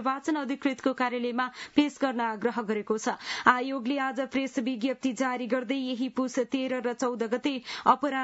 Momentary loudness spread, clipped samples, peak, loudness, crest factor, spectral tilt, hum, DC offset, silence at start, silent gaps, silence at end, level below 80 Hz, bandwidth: 6 LU; under 0.1%; -6 dBFS; -29 LUFS; 22 dB; -4 dB/octave; none; under 0.1%; 0 s; none; 0 s; -74 dBFS; 8 kHz